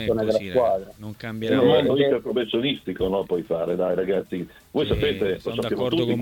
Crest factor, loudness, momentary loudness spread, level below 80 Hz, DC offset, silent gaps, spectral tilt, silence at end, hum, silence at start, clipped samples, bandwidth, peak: 16 dB; -23 LUFS; 11 LU; -46 dBFS; under 0.1%; none; -7 dB/octave; 0 s; none; 0 s; under 0.1%; 18 kHz; -6 dBFS